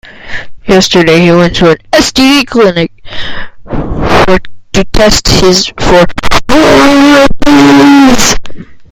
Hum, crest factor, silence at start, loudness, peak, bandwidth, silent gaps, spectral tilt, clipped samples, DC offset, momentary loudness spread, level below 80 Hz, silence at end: none; 6 dB; 0.25 s; -6 LUFS; 0 dBFS; 17.5 kHz; none; -4 dB/octave; 7%; under 0.1%; 16 LU; -20 dBFS; 0.05 s